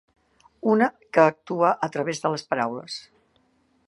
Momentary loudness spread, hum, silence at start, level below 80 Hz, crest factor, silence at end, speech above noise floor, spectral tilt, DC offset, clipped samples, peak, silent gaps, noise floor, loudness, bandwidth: 11 LU; none; 0.65 s; -74 dBFS; 22 dB; 0.9 s; 42 dB; -5.5 dB/octave; under 0.1%; under 0.1%; -2 dBFS; none; -65 dBFS; -23 LUFS; 11.5 kHz